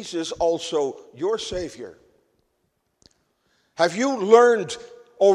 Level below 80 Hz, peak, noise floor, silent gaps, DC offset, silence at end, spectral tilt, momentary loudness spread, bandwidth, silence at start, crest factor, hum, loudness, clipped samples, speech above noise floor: -56 dBFS; 0 dBFS; -72 dBFS; none; under 0.1%; 0 s; -4 dB/octave; 20 LU; 11 kHz; 0 s; 22 dB; none; -21 LUFS; under 0.1%; 51 dB